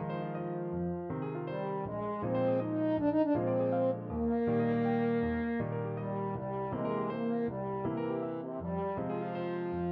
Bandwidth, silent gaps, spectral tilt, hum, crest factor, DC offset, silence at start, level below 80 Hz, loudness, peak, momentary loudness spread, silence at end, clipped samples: 5.2 kHz; none; -8 dB/octave; none; 14 dB; under 0.1%; 0 s; -58 dBFS; -34 LUFS; -20 dBFS; 7 LU; 0 s; under 0.1%